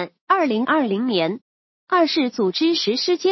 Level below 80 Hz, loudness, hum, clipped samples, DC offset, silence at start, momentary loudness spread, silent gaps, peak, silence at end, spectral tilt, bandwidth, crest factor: -78 dBFS; -20 LUFS; none; under 0.1%; under 0.1%; 0 s; 4 LU; 0.21-0.27 s, 1.41-1.87 s; -4 dBFS; 0 s; -4.5 dB/octave; 6.2 kHz; 16 dB